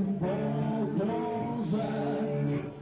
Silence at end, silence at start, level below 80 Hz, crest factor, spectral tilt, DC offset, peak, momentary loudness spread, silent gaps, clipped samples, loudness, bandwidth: 0 s; 0 s; -58 dBFS; 10 dB; -8 dB/octave; under 0.1%; -20 dBFS; 2 LU; none; under 0.1%; -31 LUFS; 4 kHz